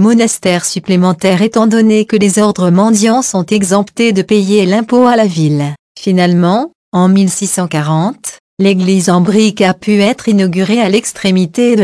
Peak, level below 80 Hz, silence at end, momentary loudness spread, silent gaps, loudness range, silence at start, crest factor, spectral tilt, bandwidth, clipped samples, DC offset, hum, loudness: 0 dBFS; -54 dBFS; 0 s; 5 LU; 5.79-5.95 s, 6.75-6.92 s, 8.40-8.57 s; 2 LU; 0 s; 10 dB; -5.5 dB/octave; 11 kHz; under 0.1%; 0.1%; none; -11 LUFS